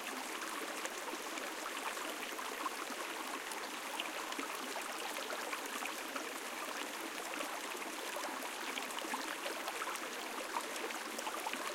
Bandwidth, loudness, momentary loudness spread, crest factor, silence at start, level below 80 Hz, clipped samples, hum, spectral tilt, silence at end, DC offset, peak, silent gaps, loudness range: 17 kHz; -41 LUFS; 2 LU; 20 dB; 0 s; -82 dBFS; under 0.1%; none; 0 dB/octave; 0 s; under 0.1%; -22 dBFS; none; 1 LU